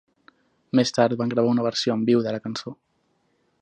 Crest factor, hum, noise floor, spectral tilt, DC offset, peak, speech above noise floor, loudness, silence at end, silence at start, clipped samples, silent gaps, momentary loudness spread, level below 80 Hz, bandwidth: 20 dB; none; -69 dBFS; -5.5 dB/octave; under 0.1%; -4 dBFS; 47 dB; -23 LUFS; 0.9 s; 0.75 s; under 0.1%; none; 11 LU; -68 dBFS; 9.4 kHz